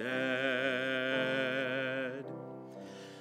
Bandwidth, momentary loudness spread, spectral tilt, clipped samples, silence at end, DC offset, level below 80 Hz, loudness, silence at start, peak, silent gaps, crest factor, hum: 13.5 kHz; 16 LU; -5 dB/octave; under 0.1%; 0 s; under 0.1%; -88 dBFS; -33 LUFS; 0 s; -18 dBFS; none; 18 dB; none